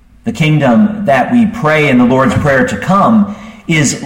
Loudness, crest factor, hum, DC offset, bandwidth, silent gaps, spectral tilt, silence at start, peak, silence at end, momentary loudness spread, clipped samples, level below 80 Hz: -10 LUFS; 10 dB; none; under 0.1%; 16 kHz; none; -5.5 dB/octave; 0.25 s; 0 dBFS; 0 s; 6 LU; under 0.1%; -38 dBFS